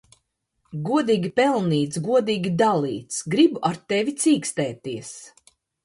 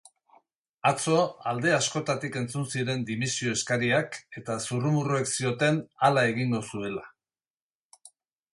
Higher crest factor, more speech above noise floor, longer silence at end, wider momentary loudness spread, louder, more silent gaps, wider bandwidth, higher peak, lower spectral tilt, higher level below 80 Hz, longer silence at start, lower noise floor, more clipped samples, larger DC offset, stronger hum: about the same, 18 dB vs 20 dB; second, 50 dB vs over 63 dB; about the same, 0.55 s vs 0.45 s; first, 13 LU vs 9 LU; first, -22 LUFS vs -27 LUFS; second, none vs 7.50-7.54 s, 7.62-7.90 s; about the same, 11.5 kHz vs 11.5 kHz; about the same, -6 dBFS vs -8 dBFS; about the same, -5 dB/octave vs -4.5 dB/octave; about the same, -64 dBFS vs -66 dBFS; second, 0.7 s vs 0.85 s; second, -72 dBFS vs under -90 dBFS; neither; neither; neither